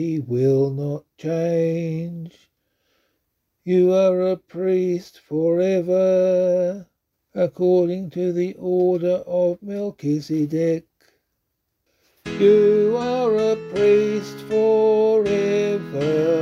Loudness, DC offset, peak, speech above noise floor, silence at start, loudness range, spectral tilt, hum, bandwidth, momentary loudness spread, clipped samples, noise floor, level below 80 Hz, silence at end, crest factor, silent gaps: -20 LUFS; under 0.1%; -4 dBFS; 56 dB; 0 s; 6 LU; -7.5 dB/octave; none; 7.6 kHz; 12 LU; under 0.1%; -75 dBFS; -62 dBFS; 0 s; 16 dB; none